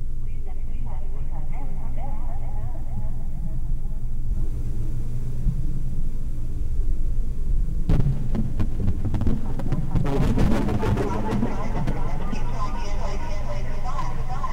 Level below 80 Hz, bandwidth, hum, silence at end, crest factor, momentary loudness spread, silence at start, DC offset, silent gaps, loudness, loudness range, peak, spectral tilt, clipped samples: -22 dBFS; 6.4 kHz; none; 0 s; 14 dB; 10 LU; 0 s; under 0.1%; none; -29 LUFS; 8 LU; -6 dBFS; -8 dB/octave; under 0.1%